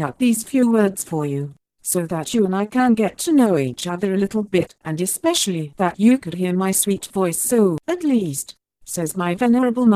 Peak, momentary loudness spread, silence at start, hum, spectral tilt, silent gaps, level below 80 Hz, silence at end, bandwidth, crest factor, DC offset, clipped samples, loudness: -2 dBFS; 9 LU; 0 s; none; -5 dB/octave; none; -58 dBFS; 0 s; 15.5 kHz; 16 dB; under 0.1%; under 0.1%; -20 LUFS